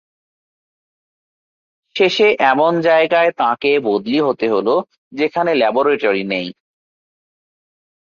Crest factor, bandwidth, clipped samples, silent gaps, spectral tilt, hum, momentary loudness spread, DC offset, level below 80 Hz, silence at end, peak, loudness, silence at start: 16 dB; 7 kHz; under 0.1%; 4.98-5.11 s; -5.5 dB/octave; none; 9 LU; under 0.1%; -64 dBFS; 1.6 s; -2 dBFS; -15 LUFS; 1.95 s